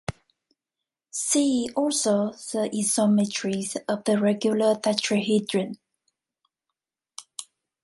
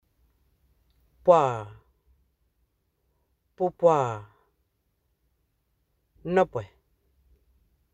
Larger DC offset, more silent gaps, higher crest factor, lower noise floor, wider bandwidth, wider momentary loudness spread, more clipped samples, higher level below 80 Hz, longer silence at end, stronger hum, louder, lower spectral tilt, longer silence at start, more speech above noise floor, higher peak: neither; neither; about the same, 22 dB vs 24 dB; first, -88 dBFS vs -74 dBFS; first, 11.5 kHz vs 8.2 kHz; second, 17 LU vs 20 LU; neither; about the same, -60 dBFS vs -64 dBFS; second, 0.4 s vs 1.3 s; neither; about the same, -24 LUFS vs -25 LUFS; second, -4 dB/octave vs -7 dB/octave; second, 0.1 s vs 1.25 s; first, 64 dB vs 51 dB; about the same, -4 dBFS vs -6 dBFS